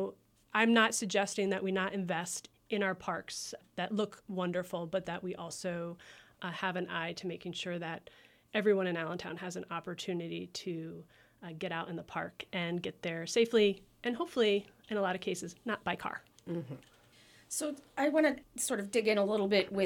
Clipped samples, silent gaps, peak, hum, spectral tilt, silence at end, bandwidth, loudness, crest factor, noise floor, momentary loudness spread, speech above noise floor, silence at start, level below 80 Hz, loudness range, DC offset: under 0.1%; none; -12 dBFS; none; -4 dB/octave; 0 s; 18 kHz; -34 LUFS; 22 dB; -62 dBFS; 12 LU; 28 dB; 0 s; -72 dBFS; 7 LU; under 0.1%